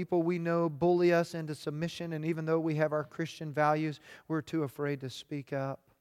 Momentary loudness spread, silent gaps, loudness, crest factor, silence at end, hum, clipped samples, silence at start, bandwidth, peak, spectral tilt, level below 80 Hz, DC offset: 11 LU; none; -32 LUFS; 18 dB; 0.25 s; none; under 0.1%; 0 s; 14.5 kHz; -14 dBFS; -7 dB/octave; -72 dBFS; under 0.1%